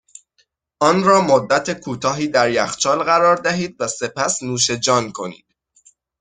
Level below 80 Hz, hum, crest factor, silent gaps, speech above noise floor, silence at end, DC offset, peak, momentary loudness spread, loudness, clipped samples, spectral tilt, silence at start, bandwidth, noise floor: -58 dBFS; none; 18 dB; none; 47 dB; 0.85 s; under 0.1%; -2 dBFS; 9 LU; -17 LUFS; under 0.1%; -3.5 dB/octave; 0.8 s; 9.6 kHz; -64 dBFS